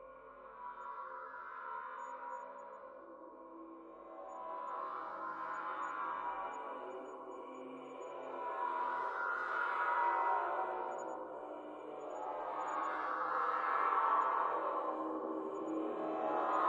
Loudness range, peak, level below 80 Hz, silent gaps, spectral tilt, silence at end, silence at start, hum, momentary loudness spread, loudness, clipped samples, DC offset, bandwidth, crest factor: 12 LU; -20 dBFS; -82 dBFS; none; -4.5 dB/octave; 0 s; 0 s; none; 18 LU; -39 LUFS; under 0.1%; under 0.1%; 8.6 kHz; 20 dB